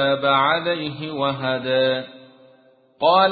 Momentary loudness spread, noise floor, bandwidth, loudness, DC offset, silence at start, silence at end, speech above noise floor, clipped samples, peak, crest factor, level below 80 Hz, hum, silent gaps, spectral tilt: 10 LU; -55 dBFS; 4.8 kHz; -20 LUFS; under 0.1%; 0 s; 0 s; 35 dB; under 0.1%; -4 dBFS; 16 dB; -62 dBFS; none; none; -9.5 dB/octave